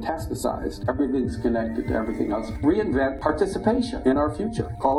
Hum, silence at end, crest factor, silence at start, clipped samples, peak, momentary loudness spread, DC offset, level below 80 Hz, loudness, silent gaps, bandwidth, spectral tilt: none; 0 s; 18 dB; 0 s; under 0.1%; -6 dBFS; 6 LU; under 0.1%; -38 dBFS; -25 LUFS; none; 12.5 kHz; -7 dB/octave